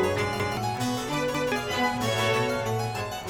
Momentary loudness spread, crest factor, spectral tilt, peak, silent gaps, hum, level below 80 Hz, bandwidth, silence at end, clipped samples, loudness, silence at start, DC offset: 4 LU; 14 dB; -4.5 dB/octave; -14 dBFS; none; none; -50 dBFS; 18.5 kHz; 0 s; under 0.1%; -27 LUFS; 0 s; under 0.1%